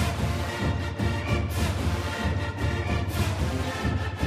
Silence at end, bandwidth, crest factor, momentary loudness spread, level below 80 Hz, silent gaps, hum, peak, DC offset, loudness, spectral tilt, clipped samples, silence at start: 0 s; 15.5 kHz; 16 dB; 2 LU; -34 dBFS; none; none; -12 dBFS; under 0.1%; -28 LUFS; -5.5 dB/octave; under 0.1%; 0 s